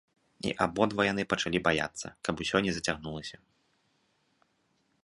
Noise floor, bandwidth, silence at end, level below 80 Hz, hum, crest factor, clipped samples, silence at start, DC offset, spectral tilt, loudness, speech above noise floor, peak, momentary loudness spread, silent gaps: -73 dBFS; 11.5 kHz; 1.7 s; -58 dBFS; none; 24 dB; under 0.1%; 0.45 s; under 0.1%; -4 dB/octave; -30 LUFS; 43 dB; -8 dBFS; 10 LU; none